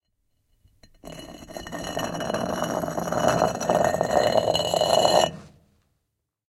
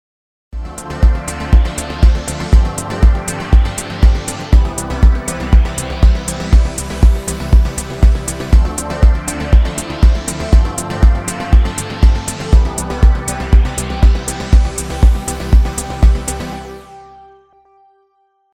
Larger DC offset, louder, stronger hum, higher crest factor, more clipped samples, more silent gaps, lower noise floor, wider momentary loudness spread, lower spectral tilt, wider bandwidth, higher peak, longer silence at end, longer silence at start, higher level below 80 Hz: neither; second, -23 LUFS vs -15 LUFS; neither; first, 22 dB vs 12 dB; neither; neither; first, -79 dBFS vs -59 dBFS; first, 20 LU vs 6 LU; second, -4 dB/octave vs -5.5 dB/octave; first, 16.5 kHz vs 13.5 kHz; second, -4 dBFS vs 0 dBFS; second, 1 s vs 1.5 s; first, 1.05 s vs 0.55 s; second, -52 dBFS vs -14 dBFS